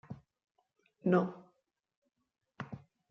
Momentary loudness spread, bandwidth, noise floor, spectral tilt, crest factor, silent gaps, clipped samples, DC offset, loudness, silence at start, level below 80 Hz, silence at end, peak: 22 LU; 6.2 kHz; -78 dBFS; -8 dB/octave; 24 dB; 1.97-2.02 s; under 0.1%; under 0.1%; -33 LUFS; 0.1 s; -76 dBFS; 0.35 s; -16 dBFS